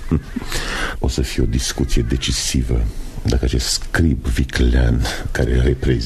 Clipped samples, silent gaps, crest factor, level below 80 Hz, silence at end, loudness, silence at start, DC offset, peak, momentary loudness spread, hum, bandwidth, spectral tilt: under 0.1%; none; 16 dB; -20 dBFS; 0 s; -19 LUFS; 0 s; under 0.1%; -2 dBFS; 5 LU; none; 13.5 kHz; -4.5 dB/octave